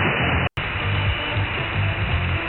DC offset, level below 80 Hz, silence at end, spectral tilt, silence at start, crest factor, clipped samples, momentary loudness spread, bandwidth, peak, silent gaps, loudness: under 0.1%; -32 dBFS; 0 s; -8 dB/octave; 0 s; 16 dB; under 0.1%; 3 LU; 4.3 kHz; -6 dBFS; none; -22 LUFS